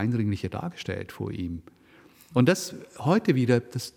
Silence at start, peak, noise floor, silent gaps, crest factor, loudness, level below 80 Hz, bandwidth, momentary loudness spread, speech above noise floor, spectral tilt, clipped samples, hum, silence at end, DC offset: 0 s; -6 dBFS; -55 dBFS; none; 20 dB; -27 LUFS; -56 dBFS; 17.5 kHz; 12 LU; 29 dB; -6.5 dB/octave; under 0.1%; none; 0.05 s; under 0.1%